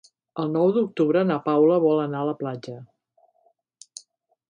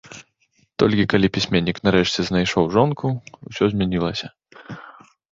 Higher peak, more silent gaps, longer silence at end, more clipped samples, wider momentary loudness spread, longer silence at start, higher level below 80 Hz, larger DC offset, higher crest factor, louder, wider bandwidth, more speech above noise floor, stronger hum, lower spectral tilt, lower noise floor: second, -8 dBFS vs -2 dBFS; neither; first, 1.65 s vs 0.5 s; neither; first, 24 LU vs 20 LU; first, 0.35 s vs 0.1 s; second, -74 dBFS vs -46 dBFS; neither; about the same, 16 dB vs 20 dB; about the same, -22 LUFS vs -20 LUFS; first, 10.5 kHz vs 7.6 kHz; about the same, 44 dB vs 44 dB; neither; first, -7.5 dB/octave vs -6 dB/octave; about the same, -66 dBFS vs -64 dBFS